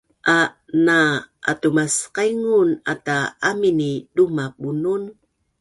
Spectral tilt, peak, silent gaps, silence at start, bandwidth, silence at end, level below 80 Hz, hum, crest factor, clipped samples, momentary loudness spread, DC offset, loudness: -4.5 dB/octave; -4 dBFS; none; 0.25 s; 11.5 kHz; 0.5 s; -60 dBFS; none; 16 dB; under 0.1%; 8 LU; under 0.1%; -20 LUFS